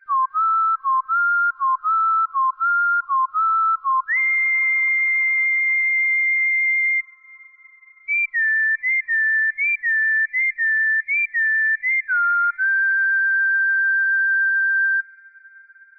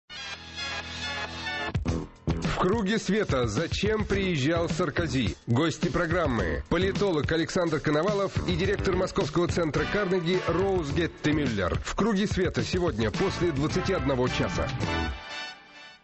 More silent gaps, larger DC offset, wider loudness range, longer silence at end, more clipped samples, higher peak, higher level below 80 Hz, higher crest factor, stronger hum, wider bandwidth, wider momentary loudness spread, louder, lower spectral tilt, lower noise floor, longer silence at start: neither; neither; about the same, 2 LU vs 2 LU; first, 0.95 s vs 0.1 s; neither; about the same, -14 dBFS vs -14 dBFS; second, -78 dBFS vs -40 dBFS; second, 6 dB vs 12 dB; neither; second, 6.6 kHz vs 8.4 kHz; second, 4 LU vs 7 LU; first, -18 LUFS vs -27 LUFS; second, 2 dB/octave vs -5.5 dB/octave; about the same, -49 dBFS vs -49 dBFS; about the same, 0.1 s vs 0.1 s